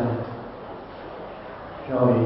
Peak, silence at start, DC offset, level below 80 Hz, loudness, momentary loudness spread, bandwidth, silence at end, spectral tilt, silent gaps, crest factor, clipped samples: -6 dBFS; 0 s; under 0.1%; -54 dBFS; -30 LUFS; 16 LU; 5.8 kHz; 0 s; -12.5 dB/octave; none; 20 dB; under 0.1%